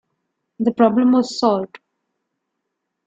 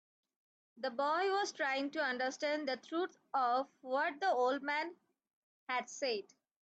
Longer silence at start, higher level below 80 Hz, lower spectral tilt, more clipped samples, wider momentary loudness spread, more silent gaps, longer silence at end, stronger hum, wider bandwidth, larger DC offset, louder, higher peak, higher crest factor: second, 0.6 s vs 0.75 s; first, -66 dBFS vs under -90 dBFS; first, -6 dB/octave vs -2 dB/octave; neither; first, 9 LU vs 6 LU; second, none vs 5.33-5.67 s; first, 1.4 s vs 0.4 s; neither; second, 7.8 kHz vs 8.8 kHz; neither; first, -17 LUFS vs -36 LUFS; first, -2 dBFS vs -22 dBFS; about the same, 18 dB vs 14 dB